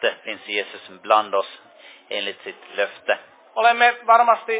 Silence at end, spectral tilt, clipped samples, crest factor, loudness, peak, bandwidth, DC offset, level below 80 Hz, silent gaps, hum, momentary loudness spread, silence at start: 0 s; -5 dB/octave; under 0.1%; 20 dB; -20 LUFS; -2 dBFS; 4 kHz; under 0.1%; -84 dBFS; none; none; 17 LU; 0 s